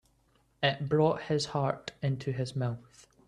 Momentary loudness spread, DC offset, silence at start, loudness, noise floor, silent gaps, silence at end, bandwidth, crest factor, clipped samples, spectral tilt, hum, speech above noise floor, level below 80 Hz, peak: 7 LU; under 0.1%; 0.6 s; -31 LUFS; -69 dBFS; none; 0.45 s; 11 kHz; 20 dB; under 0.1%; -6 dB/octave; none; 38 dB; -64 dBFS; -12 dBFS